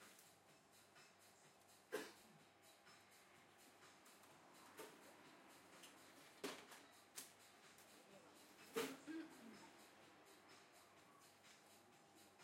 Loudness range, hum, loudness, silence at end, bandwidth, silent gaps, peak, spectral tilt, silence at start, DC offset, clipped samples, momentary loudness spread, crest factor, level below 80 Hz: 9 LU; none; -60 LUFS; 0 s; 16 kHz; none; -32 dBFS; -2.5 dB/octave; 0 s; under 0.1%; under 0.1%; 15 LU; 28 dB; under -90 dBFS